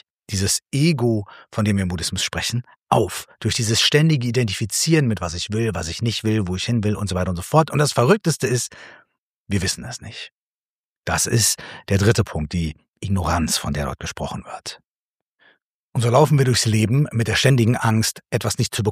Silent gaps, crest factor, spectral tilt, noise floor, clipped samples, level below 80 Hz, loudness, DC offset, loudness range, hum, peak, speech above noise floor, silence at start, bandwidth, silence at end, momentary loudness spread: 2.81-2.86 s, 9.18-9.46 s, 10.32-11.03 s, 12.90-12.94 s, 14.87-15.38 s, 15.62-15.93 s; 18 dB; -4.5 dB/octave; under -90 dBFS; under 0.1%; -42 dBFS; -20 LUFS; under 0.1%; 5 LU; none; -2 dBFS; over 70 dB; 0.3 s; 15.5 kHz; 0 s; 13 LU